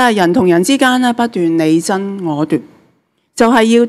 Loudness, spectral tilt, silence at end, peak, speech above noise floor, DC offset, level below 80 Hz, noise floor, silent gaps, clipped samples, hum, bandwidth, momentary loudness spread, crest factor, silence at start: -13 LUFS; -5 dB/octave; 0 s; 0 dBFS; 47 dB; under 0.1%; -54 dBFS; -58 dBFS; none; under 0.1%; none; 14 kHz; 8 LU; 12 dB; 0 s